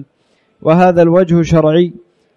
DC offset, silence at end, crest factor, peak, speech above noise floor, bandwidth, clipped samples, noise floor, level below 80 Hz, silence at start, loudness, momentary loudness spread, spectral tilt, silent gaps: under 0.1%; 0.45 s; 12 dB; 0 dBFS; 48 dB; 7.4 kHz; under 0.1%; -58 dBFS; -40 dBFS; 0 s; -11 LUFS; 8 LU; -8 dB/octave; none